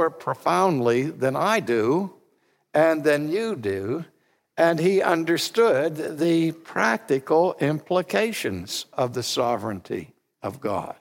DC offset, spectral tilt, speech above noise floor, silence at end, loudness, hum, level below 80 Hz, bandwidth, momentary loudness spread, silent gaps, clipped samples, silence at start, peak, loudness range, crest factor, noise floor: under 0.1%; -5 dB/octave; 43 dB; 0.1 s; -23 LUFS; none; -70 dBFS; 17 kHz; 10 LU; none; under 0.1%; 0 s; -6 dBFS; 3 LU; 16 dB; -66 dBFS